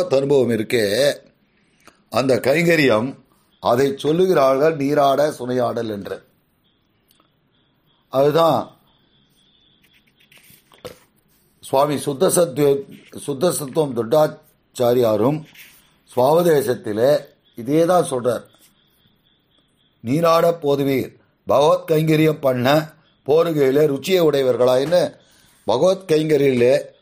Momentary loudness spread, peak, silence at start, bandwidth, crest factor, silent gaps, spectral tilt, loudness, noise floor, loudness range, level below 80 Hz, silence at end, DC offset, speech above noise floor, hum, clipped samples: 13 LU; -4 dBFS; 0 s; 15.5 kHz; 16 dB; none; -5.5 dB/octave; -18 LUFS; -63 dBFS; 6 LU; -60 dBFS; 0.15 s; under 0.1%; 46 dB; none; under 0.1%